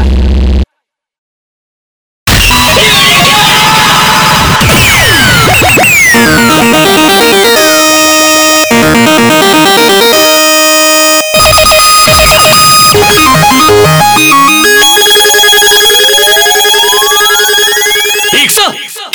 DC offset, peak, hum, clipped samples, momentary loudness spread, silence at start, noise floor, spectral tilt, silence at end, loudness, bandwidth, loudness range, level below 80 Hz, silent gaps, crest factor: under 0.1%; 0 dBFS; none; 0.2%; 4 LU; 0 s; -69 dBFS; -2.5 dB/octave; 0.05 s; -3 LUFS; over 20 kHz; 2 LU; -20 dBFS; 1.18-2.26 s; 4 dB